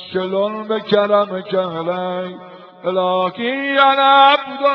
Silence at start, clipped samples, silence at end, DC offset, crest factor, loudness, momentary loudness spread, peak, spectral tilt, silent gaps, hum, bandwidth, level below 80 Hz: 0 s; under 0.1%; 0 s; under 0.1%; 16 dB; -16 LUFS; 13 LU; 0 dBFS; -7 dB/octave; none; none; 5.4 kHz; -64 dBFS